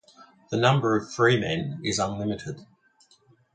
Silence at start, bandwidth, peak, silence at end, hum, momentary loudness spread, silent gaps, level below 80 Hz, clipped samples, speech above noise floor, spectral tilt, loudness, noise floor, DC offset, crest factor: 0.2 s; 9.4 kHz; -4 dBFS; 0.9 s; none; 12 LU; none; -56 dBFS; under 0.1%; 37 dB; -5 dB/octave; -25 LUFS; -62 dBFS; under 0.1%; 22 dB